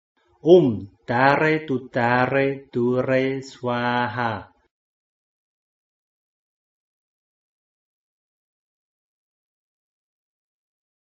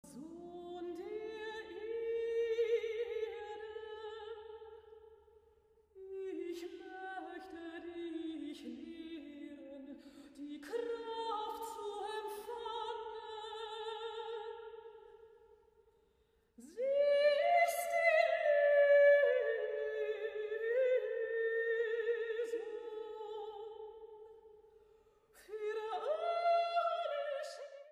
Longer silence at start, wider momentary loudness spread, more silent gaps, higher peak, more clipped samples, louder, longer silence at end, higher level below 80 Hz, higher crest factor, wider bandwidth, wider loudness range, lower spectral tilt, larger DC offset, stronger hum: first, 0.45 s vs 0.05 s; second, 11 LU vs 20 LU; neither; first, -2 dBFS vs -18 dBFS; neither; first, -21 LUFS vs -36 LUFS; first, 6.6 s vs 0 s; first, -62 dBFS vs -78 dBFS; about the same, 22 dB vs 20 dB; second, 7.6 kHz vs 15 kHz; second, 11 LU vs 17 LU; first, -5 dB/octave vs -2.5 dB/octave; neither; neither